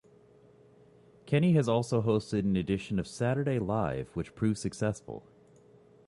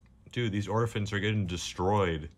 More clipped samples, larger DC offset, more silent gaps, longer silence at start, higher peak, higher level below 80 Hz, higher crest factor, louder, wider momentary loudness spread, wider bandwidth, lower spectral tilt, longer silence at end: neither; neither; neither; first, 1.25 s vs 0.25 s; about the same, -14 dBFS vs -16 dBFS; second, -56 dBFS vs -50 dBFS; about the same, 18 dB vs 14 dB; about the same, -30 LUFS vs -31 LUFS; first, 10 LU vs 6 LU; second, 11.5 kHz vs 13 kHz; first, -7 dB/octave vs -5.5 dB/octave; first, 0.9 s vs 0.1 s